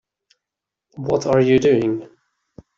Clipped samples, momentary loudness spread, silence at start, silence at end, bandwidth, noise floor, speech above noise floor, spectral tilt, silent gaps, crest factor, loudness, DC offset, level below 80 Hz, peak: under 0.1%; 13 LU; 0.95 s; 0.75 s; 7.4 kHz; -85 dBFS; 68 dB; -7 dB/octave; none; 16 dB; -18 LUFS; under 0.1%; -54 dBFS; -4 dBFS